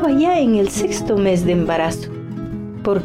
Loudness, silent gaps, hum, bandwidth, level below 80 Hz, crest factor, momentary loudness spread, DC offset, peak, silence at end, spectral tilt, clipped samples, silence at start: -18 LUFS; none; none; 16 kHz; -40 dBFS; 10 dB; 13 LU; under 0.1%; -8 dBFS; 0 s; -6 dB/octave; under 0.1%; 0 s